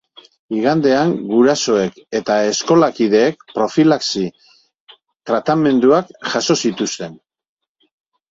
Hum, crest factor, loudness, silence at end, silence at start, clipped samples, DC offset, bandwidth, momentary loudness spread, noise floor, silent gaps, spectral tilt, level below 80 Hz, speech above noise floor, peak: none; 16 dB; -16 LUFS; 1.15 s; 0.5 s; under 0.1%; under 0.1%; 7.8 kHz; 9 LU; -49 dBFS; 4.80-4.87 s, 5.16-5.20 s; -4.5 dB/octave; -58 dBFS; 34 dB; 0 dBFS